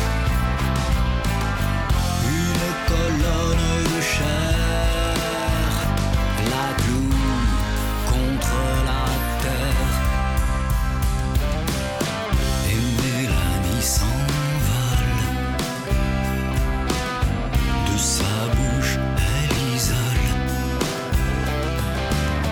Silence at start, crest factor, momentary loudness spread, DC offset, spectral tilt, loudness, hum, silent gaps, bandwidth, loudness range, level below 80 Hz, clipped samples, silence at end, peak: 0 s; 12 dB; 3 LU; under 0.1%; -4.5 dB/octave; -22 LUFS; none; none; 18 kHz; 2 LU; -24 dBFS; under 0.1%; 0 s; -8 dBFS